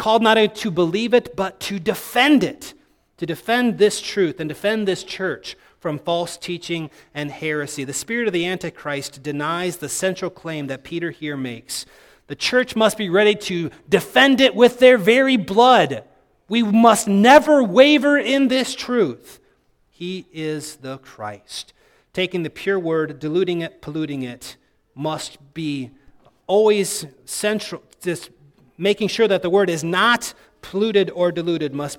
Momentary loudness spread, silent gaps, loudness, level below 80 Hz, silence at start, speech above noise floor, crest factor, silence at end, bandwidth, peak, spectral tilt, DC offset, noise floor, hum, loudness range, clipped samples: 17 LU; none; -19 LUFS; -58 dBFS; 0 s; 42 dB; 20 dB; 0.05 s; 18 kHz; 0 dBFS; -4 dB/octave; under 0.1%; -61 dBFS; none; 11 LU; under 0.1%